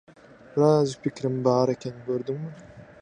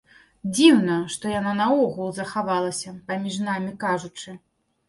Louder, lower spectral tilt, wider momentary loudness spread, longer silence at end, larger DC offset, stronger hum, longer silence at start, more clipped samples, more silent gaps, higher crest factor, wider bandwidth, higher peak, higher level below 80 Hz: about the same, -25 LUFS vs -23 LUFS; first, -7.5 dB/octave vs -4.5 dB/octave; about the same, 13 LU vs 15 LU; second, 0.2 s vs 0.5 s; neither; neither; about the same, 0.55 s vs 0.45 s; neither; neither; about the same, 20 dB vs 20 dB; second, 9.8 kHz vs 11.5 kHz; about the same, -6 dBFS vs -4 dBFS; about the same, -64 dBFS vs -62 dBFS